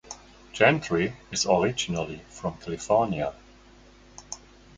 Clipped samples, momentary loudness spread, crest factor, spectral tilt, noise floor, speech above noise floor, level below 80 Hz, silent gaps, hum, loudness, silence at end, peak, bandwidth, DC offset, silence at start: under 0.1%; 20 LU; 24 dB; -4 dB/octave; -53 dBFS; 27 dB; -54 dBFS; none; none; -26 LUFS; 0.4 s; -4 dBFS; 9.6 kHz; under 0.1%; 0.1 s